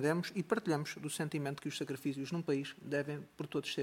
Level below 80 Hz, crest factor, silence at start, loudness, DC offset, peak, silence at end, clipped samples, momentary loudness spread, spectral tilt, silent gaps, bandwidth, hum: -78 dBFS; 20 dB; 0 s; -38 LUFS; under 0.1%; -18 dBFS; 0 s; under 0.1%; 6 LU; -5.5 dB/octave; none; 17 kHz; none